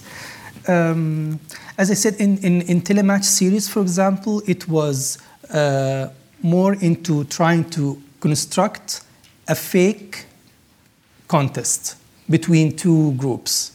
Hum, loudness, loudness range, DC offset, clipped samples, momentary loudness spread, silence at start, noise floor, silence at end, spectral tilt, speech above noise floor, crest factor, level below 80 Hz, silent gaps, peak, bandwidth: none; -19 LUFS; 5 LU; under 0.1%; under 0.1%; 13 LU; 0.05 s; -55 dBFS; 0.05 s; -5 dB/octave; 37 dB; 18 dB; -64 dBFS; none; -2 dBFS; 18 kHz